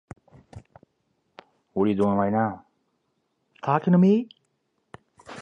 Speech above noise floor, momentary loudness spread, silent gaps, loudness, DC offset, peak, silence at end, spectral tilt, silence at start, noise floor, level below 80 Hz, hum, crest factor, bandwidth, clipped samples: 53 dB; 21 LU; none; -23 LUFS; under 0.1%; -8 dBFS; 0 s; -9.5 dB/octave; 0.55 s; -74 dBFS; -60 dBFS; none; 20 dB; 6.8 kHz; under 0.1%